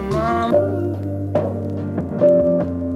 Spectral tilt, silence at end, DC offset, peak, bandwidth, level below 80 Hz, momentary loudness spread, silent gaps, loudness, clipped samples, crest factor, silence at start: -9 dB/octave; 0 s; under 0.1%; -4 dBFS; 11 kHz; -42 dBFS; 10 LU; none; -19 LUFS; under 0.1%; 14 dB; 0 s